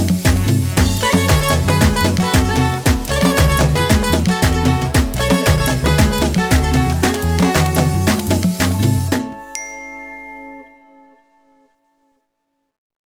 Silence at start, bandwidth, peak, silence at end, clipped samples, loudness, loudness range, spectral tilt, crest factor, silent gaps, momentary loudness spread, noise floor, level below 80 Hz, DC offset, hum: 0 s; over 20 kHz; 0 dBFS; 2.4 s; under 0.1%; -15 LUFS; 9 LU; -5 dB/octave; 16 dB; none; 13 LU; -71 dBFS; -24 dBFS; under 0.1%; none